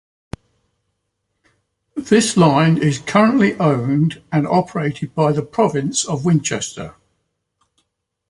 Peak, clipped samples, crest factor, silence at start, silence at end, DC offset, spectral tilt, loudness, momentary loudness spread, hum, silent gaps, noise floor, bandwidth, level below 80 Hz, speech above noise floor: -2 dBFS; under 0.1%; 18 dB; 1.95 s; 1.4 s; under 0.1%; -5.5 dB/octave; -17 LUFS; 19 LU; 50 Hz at -40 dBFS; none; -73 dBFS; 11.5 kHz; -52 dBFS; 57 dB